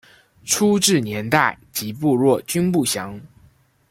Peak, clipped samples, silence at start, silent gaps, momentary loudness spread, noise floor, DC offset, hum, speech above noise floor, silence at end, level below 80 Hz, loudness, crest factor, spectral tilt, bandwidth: -2 dBFS; under 0.1%; 0.45 s; none; 11 LU; -55 dBFS; under 0.1%; none; 36 dB; 0.65 s; -56 dBFS; -19 LUFS; 20 dB; -4 dB/octave; 16.5 kHz